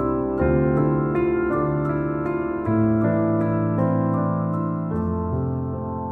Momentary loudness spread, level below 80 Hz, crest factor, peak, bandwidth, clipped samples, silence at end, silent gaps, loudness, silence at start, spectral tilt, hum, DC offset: 5 LU; -40 dBFS; 14 dB; -8 dBFS; 3.8 kHz; under 0.1%; 0 s; none; -22 LUFS; 0 s; -12 dB/octave; none; under 0.1%